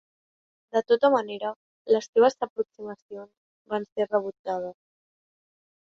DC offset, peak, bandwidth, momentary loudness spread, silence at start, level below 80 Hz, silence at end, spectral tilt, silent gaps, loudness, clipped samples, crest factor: under 0.1%; -8 dBFS; 7.4 kHz; 19 LU; 0.75 s; -74 dBFS; 1.15 s; -5 dB/octave; 1.56-1.85 s, 2.09-2.13 s, 2.50-2.56 s, 3.02-3.09 s, 3.37-3.65 s, 3.92-3.96 s, 4.39-4.44 s; -26 LUFS; under 0.1%; 20 dB